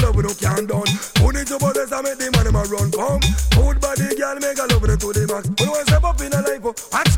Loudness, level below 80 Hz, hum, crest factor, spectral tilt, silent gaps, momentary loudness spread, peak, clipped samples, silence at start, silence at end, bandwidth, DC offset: -19 LUFS; -22 dBFS; none; 14 dB; -4.5 dB/octave; none; 5 LU; -2 dBFS; under 0.1%; 0 s; 0 s; 17 kHz; under 0.1%